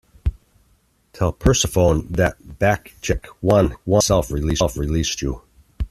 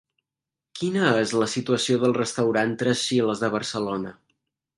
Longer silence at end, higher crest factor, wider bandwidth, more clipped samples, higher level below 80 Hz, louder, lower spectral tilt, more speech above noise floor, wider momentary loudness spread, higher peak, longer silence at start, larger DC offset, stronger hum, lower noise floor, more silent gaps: second, 0.05 s vs 0.65 s; about the same, 18 dB vs 20 dB; first, 14 kHz vs 11.5 kHz; neither; first, -32 dBFS vs -64 dBFS; first, -20 LUFS vs -24 LUFS; about the same, -5 dB/octave vs -4.5 dB/octave; second, 42 dB vs 65 dB; first, 12 LU vs 9 LU; first, -2 dBFS vs -6 dBFS; second, 0.25 s vs 0.75 s; neither; neither; second, -60 dBFS vs -88 dBFS; neither